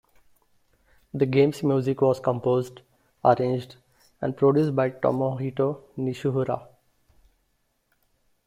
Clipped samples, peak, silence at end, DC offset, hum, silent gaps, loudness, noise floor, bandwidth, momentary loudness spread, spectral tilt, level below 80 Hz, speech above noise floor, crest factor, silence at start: under 0.1%; -4 dBFS; 1.85 s; under 0.1%; none; none; -24 LUFS; -71 dBFS; 14.5 kHz; 11 LU; -8 dB/octave; -62 dBFS; 48 dB; 22 dB; 1.15 s